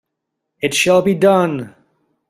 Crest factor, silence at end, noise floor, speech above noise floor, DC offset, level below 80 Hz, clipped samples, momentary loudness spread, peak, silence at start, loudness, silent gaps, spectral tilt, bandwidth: 16 dB; 0.6 s; -77 dBFS; 63 dB; under 0.1%; -56 dBFS; under 0.1%; 13 LU; -2 dBFS; 0.6 s; -15 LUFS; none; -4.5 dB/octave; 15 kHz